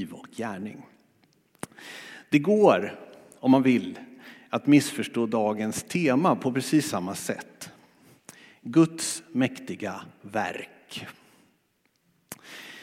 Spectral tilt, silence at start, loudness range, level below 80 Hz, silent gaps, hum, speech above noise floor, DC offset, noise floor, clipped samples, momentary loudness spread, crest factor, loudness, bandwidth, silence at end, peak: -5.5 dB/octave; 0 s; 7 LU; -74 dBFS; none; none; 45 dB; under 0.1%; -70 dBFS; under 0.1%; 22 LU; 22 dB; -25 LUFS; 16 kHz; 0 s; -6 dBFS